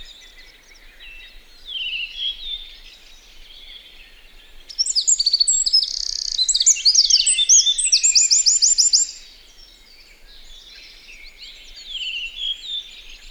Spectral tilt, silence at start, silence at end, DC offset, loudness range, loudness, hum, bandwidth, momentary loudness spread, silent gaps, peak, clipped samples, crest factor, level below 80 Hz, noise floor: 5 dB/octave; 0 s; 0 s; under 0.1%; 17 LU; -15 LUFS; none; over 20 kHz; 19 LU; none; -4 dBFS; under 0.1%; 18 dB; -46 dBFS; -47 dBFS